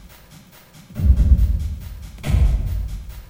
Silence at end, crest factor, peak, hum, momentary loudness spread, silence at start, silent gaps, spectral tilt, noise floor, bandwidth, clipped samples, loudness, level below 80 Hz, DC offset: 0.05 s; 18 dB; -2 dBFS; none; 17 LU; 0.05 s; none; -7.5 dB/octave; -46 dBFS; 16.5 kHz; under 0.1%; -21 LUFS; -20 dBFS; under 0.1%